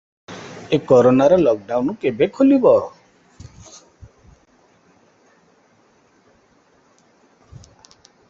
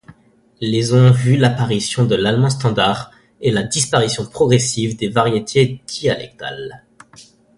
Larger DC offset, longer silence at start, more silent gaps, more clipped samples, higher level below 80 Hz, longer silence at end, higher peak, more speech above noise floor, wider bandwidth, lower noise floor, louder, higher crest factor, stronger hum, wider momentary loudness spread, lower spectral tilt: neither; first, 0.3 s vs 0.1 s; neither; neither; second, -56 dBFS vs -48 dBFS; first, 5.4 s vs 0.35 s; about the same, 0 dBFS vs 0 dBFS; first, 42 dB vs 35 dB; second, 7.6 kHz vs 11.5 kHz; first, -57 dBFS vs -51 dBFS; about the same, -16 LUFS vs -16 LUFS; about the same, 20 dB vs 16 dB; neither; first, 23 LU vs 13 LU; first, -7 dB/octave vs -5 dB/octave